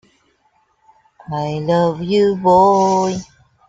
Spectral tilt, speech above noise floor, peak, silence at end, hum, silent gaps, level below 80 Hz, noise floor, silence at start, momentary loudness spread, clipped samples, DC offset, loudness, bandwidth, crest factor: -6.5 dB/octave; 46 dB; -2 dBFS; 0.45 s; none; none; -52 dBFS; -61 dBFS; 1.3 s; 13 LU; under 0.1%; under 0.1%; -15 LUFS; 7.8 kHz; 16 dB